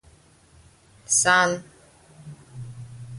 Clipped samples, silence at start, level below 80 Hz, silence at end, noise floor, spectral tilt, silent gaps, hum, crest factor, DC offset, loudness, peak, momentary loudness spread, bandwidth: under 0.1%; 1.1 s; -60 dBFS; 0 s; -55 dBFS; -1.5 dB/octave; none; none; 22 dB; under 0.1%; -20 LUFS; -6 dBFS; 27 LU; 11.5 kHz